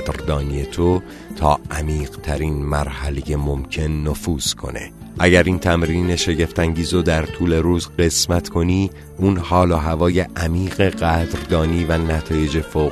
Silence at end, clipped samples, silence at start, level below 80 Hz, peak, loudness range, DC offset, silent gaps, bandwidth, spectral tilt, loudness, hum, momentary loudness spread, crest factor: 0 s; under 0.1%; 0 s; -28 dBFS; 0 dBFS; 4 LU; under 0.1%; none; 13.5 kHz; -5.5 dB/octave; -19 LUFS; none; 7 LU; 18 dB